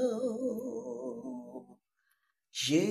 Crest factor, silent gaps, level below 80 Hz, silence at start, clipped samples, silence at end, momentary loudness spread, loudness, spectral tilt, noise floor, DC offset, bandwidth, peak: 20 dB; none; -80 dBFS; 0 s; under 0.1%; 0 s; 16 LU; -36 LUFS; -4.5 dB/octave; -78 dBFS; under 0.1%; 14.5 kHz; -16 dBFS